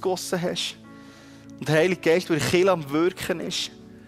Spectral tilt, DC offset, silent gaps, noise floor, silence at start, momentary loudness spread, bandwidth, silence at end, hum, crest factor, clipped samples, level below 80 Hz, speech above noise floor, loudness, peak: -4.5 dB/octave; under 0.1%; none; -46 dBFS; 0 s; 10 LU; 15.5 kHz; 0.05 s; none; 18 dB; under 0.1%; -58 dBFS; 23 dB; -24 LUFS; -8 dBFS